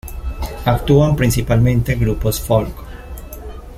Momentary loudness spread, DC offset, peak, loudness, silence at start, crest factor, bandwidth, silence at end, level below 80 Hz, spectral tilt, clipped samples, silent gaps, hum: 20 LU; under 0.1%; -2 dBFS; -16 LUFS; 0.05 s; 16 dB; 16 kHz; 0 s; -26 dBFS; -6.5 dB/octave; under 0.1%; none; none